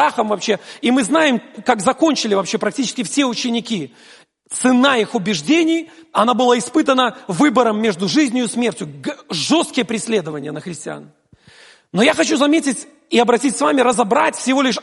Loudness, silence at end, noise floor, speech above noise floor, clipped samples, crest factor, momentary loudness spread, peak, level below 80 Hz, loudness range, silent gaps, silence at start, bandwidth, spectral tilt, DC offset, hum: -17 LUFS; 0 s; -47 dBFS; 31 dB; under 0.1%; 16 dB; 12 LU; 0 dBFS; -64 dBFS; 4 LU; none; 0 s; 11.5 kHz; -3.5 dB/octave; under 0.1%; none